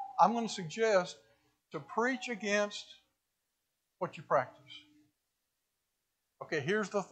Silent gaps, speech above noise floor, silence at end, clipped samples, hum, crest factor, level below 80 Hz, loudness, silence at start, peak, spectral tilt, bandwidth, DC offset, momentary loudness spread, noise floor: none; 51 dB; 0.05 s; under 0.1%; none; 24 dB; -86 dBFS; -33 LUFS; 0 s; -12 dBFS; -4 dB/octave; 9.2 kHz; under 0.1%; 23 LU; -85 dBFS